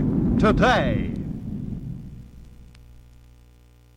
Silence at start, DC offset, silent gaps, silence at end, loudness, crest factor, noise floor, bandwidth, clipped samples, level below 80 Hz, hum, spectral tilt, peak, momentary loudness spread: 0 s; under 0.1%; none; 0.95 s; -22 LUFS; 16 dB; -52 dBFS; 11 kHz; under 0.1%; -36 dBFS; 60 Hz at -45 dBFS; -7 dB/octave; -8 dBFS; 20 LU